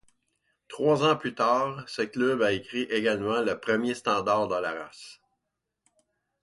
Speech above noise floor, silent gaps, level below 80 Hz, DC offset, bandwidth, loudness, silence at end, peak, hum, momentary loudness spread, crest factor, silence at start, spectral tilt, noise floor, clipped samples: 57 dB; none; -66 dBFS; under 0.1%; 11.5 kHz; -27 LUFS; 1.3 s; -12 dBFS; none; 12 LU; 18 dB; 0.7 s; -5 dB/octave; -83 dBFS; under 0.1%